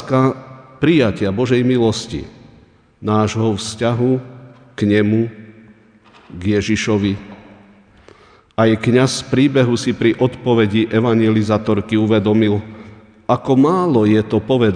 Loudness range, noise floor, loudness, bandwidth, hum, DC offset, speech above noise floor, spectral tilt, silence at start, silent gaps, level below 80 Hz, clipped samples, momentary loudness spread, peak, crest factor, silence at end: 5 LU; -48 dBFS; -16 LUFS; 10 kHz; none; under 0.1%; 33 dB; -6.5 dB/octave; 0 s; none; -48 dBFS; under 0.1%; 11 LU; 0 dBFS; 16 dB; 0 s